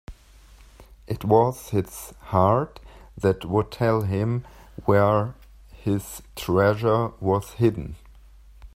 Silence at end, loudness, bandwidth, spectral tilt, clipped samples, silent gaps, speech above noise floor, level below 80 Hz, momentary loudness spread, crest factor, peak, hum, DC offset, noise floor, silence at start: 0.1 s; -23 LUFS; 16 kHz; -7.5 dB/octave; under 0.1%; none; 27 dB; -48 dBFS; 15 LU; 20 dB; -4 dBFS; none; under 0.1%; -50 dBFS; 0.1 s